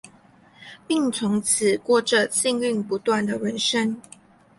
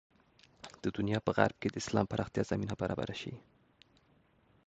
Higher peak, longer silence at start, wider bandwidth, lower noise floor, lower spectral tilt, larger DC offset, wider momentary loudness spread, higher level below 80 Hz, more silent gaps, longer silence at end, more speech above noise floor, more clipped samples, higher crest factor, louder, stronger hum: first, -6 dBFS vs -10 dBFS; second, 0.05 s vs 0.65 s; first, 12 kHz vs 8.8 kHz; second, -53 dBFS vs -69 dBFS; second, -3 dB/octave vs -6 dB/octave; neither; second, 6 LU vs 15 LU; second, -66 dBFS vs -60 dBFS; neither; second, 0.6 s vs 1.3 s; second, 31 dB vs 35 dB; neither; second, 18 dB vs 26 dB; first, -22 LUFS vs -35 LUFS; neither